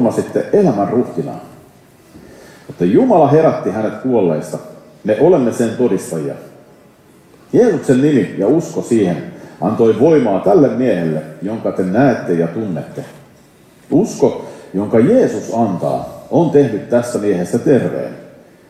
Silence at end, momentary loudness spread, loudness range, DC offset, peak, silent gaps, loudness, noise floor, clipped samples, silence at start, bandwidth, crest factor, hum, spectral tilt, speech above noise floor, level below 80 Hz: 0.4 s; 13 LU; 4 LU; under 0.1%; 0 dBFS; none; -15 LUFS; -46 dBFS; under 0.1%; 0 s; 14 kHz; 14 dB; none; -7.5 dB/octave; 32 dB; -56 dBFS